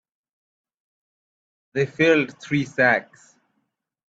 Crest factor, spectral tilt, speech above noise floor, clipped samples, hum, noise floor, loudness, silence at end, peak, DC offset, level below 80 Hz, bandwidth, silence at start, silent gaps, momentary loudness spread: 22 dB; -6 dB/octave; 54 dB; under 0.1%; none; -75 dBFS; -21 LUFS; 1.05 s; -4 dBFS; under 0.1%; -66 dBFS; 8 kHz; 1.75 s; none; 8 LU